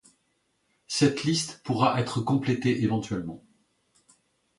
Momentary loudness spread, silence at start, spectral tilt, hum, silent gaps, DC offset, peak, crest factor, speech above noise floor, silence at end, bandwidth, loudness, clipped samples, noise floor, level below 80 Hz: 10 LU; 0.9 s; -5 dB/octave; none; none; under 0.1%; -8 dBFS; 20 dB; 47 dB; 1.2 s; 11.5 kHz; -26 LUFS; under 0.1%; -73 dBFS; -60 dBFS